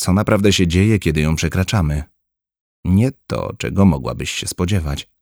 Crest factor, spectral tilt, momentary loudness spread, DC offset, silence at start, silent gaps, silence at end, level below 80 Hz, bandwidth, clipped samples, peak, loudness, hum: 16 dB; -5.5 dB/octave; 10 LU; under 0.1%; 0 s; 2.61-2.83 s; 0.2 s; -32 dBFS; over 20 kHz; under 0.1%; -2 dBFS; -18 LUFS; none